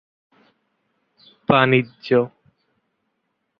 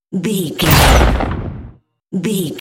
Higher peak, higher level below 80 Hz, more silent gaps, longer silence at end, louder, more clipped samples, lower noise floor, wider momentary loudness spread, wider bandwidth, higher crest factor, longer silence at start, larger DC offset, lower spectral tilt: about the same, -2 dBFS vs 0 dBFS; second, -60 dBFS vs -20 dBFS; neither; first, 1.35 s vs 0 s; second, -19 LUFS vs -14 LUFS; neither; first, -74 dBFS vs -39 dBFS; about the same, 14 LU vs 16 LU; second, 5.6 kHz vs 17.5 kHz; first, 22 dB vs 14 dB; first, 1.5 s vs 0.1 s; neither; first, -9 dB/octave vs -4.5 dB/octave